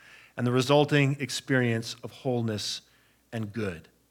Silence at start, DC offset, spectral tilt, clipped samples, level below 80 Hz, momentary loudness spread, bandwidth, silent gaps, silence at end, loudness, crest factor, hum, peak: 0.35 s; under 0.1%; -5.5 dB/octave; under 0.1%; -70 dBFS; 15 LU; 17 kHz; none; 0.3 s; -28 LUFS; 20 dB; none; -8 dBFS